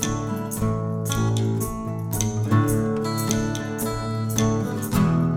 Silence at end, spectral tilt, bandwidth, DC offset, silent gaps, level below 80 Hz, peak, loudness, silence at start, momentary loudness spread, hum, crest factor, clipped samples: 0 s; -5.5 dB/octave; 17.5 kHz; under 0.1%; none; -40 dBFS; -6 dBFS; -24 LUFS; 0 s; 6 LU; none; 18 dB; under 0.1%